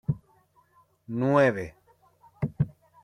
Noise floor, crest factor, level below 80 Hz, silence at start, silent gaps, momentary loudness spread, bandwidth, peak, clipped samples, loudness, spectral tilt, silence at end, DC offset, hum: -64 dBFS; 20 dB; -56 dBFS; 0.1 s; none; 15 LU; 11 kHz; -8 dBFS; under 0.1%; -27 LUFS; -8.5 dB/octave; 0.35 s; under 0.1%; none